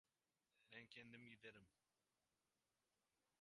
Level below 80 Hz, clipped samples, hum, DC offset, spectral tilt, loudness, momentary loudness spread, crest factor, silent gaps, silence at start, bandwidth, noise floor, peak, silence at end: under -90 dBFS; under 0.1%; none; under 0.1%; -4.5 dB/octave; -63 LUFS; 3 LU; 24 dB; none; 0.55 s; 11 kHz; under -90 dBFS; -46 dBFS; 1.7 s